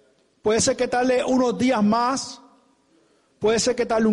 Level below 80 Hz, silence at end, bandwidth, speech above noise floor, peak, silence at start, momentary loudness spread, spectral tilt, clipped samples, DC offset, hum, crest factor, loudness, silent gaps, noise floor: -54 dBFS; 0 s; 11.5 kHz; 41 dB; -10 dBFS; 0.45 s; 6 LU; -4 dB/octave; under 0.1%; under 0.1%; none; 12 dB; -21 LUFS; none; -61 dBFS